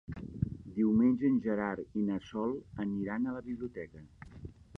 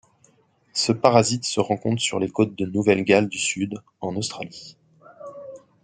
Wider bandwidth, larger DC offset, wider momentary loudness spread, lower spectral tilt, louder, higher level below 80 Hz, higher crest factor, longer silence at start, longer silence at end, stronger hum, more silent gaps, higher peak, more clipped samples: second, 6.2 kHz vs 9.6 kHz; neither; about the same, 22 LU vs 22 LU; first, -9.5 dB/octave vs -4.5 dB/octave; second, -33 LUFS vs -22 LUFS; first, -56 dBFS vs -64 dBFS; second, 16 dB vs 24 dB; second, 0.1 s vs 0.75 s; about the same, 0.25 s vs 0.25 s; neither; neither; second, -18 dBFS vs 0 dBFS; neither